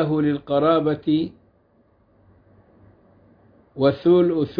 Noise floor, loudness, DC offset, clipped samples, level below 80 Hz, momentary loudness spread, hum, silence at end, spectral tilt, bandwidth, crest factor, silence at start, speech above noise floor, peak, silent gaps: -60 dBFS; -20 LUFS; under 0.1%; under 0.1%; -58 dBFS; 7 LU; none; 0.05 s; -10.5 dB/octave; 5 kHz; 16 dB; 0 s; 41 dB; -6 dBFS; none